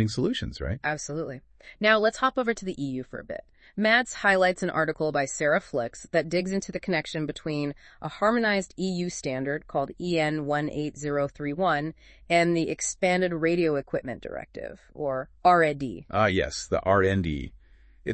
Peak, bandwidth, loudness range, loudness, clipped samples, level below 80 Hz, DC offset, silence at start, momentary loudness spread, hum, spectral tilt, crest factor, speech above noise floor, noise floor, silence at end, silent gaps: -8 dBFS; 8.8 kHz; 3 LU; -26 LUFS; under 0.1%; -50 dBFS; under 0.1%; 0 s; 15 LU; none; -5 dB/octave; 20 dB; 25 dB; -52 dBFS; 0 s; none